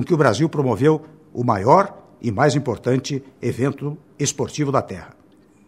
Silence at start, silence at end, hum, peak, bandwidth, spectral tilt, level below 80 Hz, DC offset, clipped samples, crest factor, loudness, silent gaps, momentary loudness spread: 0 s; 0.6 s; none; 0 dBFS; 14 kHz; -6 dB/octave; -58 dBFS; under 0.1%; under 0.1%; 20 dB; -20 LUFS; none; 13 LU